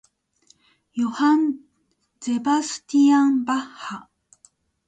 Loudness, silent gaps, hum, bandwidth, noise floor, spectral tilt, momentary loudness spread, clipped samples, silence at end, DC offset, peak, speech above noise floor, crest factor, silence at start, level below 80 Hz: -21 LUFS; none; none; 9.2 kHz; -69 dBFS; -3.5 dB/octave; 18 LU; under 0.1%; 0.85 s; under 0.1%; -10 dBFS; 49 dB; 14 dB; 0.95 s; -70 dBFS